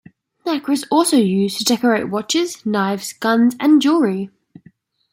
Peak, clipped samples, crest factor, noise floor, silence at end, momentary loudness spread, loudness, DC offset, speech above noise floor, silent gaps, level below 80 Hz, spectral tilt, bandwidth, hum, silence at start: -2 dBFS; under 0.1%; 16 dB; -51 dBFS; 0.85 s; 9 LU; -17 LUFS; under 0.1%; 35 dB; none; -66 dBFS; -4.5 dB/octave; 16.5 kHz; none; 0.45 s